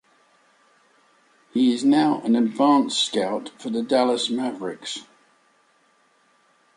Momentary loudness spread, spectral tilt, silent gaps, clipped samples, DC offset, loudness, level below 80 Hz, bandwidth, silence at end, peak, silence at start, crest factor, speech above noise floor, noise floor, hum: 12 LU; -4 dB/octave; none; under 0.1%; under 0.1%; -22 LUFS; -74 dBFS; 11 kHz; 1.75 s; -6 dBFS; 1.55 s; 18 dB; 41 dB; -62 dBFS; none